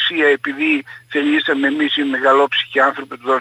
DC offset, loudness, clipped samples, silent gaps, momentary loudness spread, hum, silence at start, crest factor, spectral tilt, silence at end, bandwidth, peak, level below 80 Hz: under 0.1%; -16 LUFS; under 0.1%; none; 6 LU; none; 0 s; 14 dB; -4 dB/octave; 0 s; 11 kHz; -2 dBFS; -72 dBFS